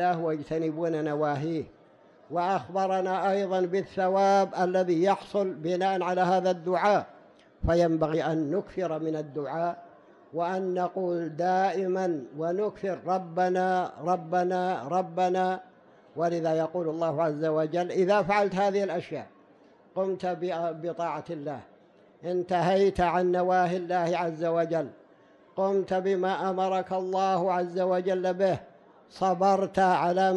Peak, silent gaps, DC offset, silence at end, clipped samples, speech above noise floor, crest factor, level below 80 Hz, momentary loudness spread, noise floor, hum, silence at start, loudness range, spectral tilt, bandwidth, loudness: -14 dBFS; none; under 0.1%; 0 s; under 0.1%; 31 dB; 14 dB; -54 dBFS; 9 LU; -57 dBFS; none; 0 s; 4 LU; -6.5 dB/octave; 10.5 kHz; -27 LUFS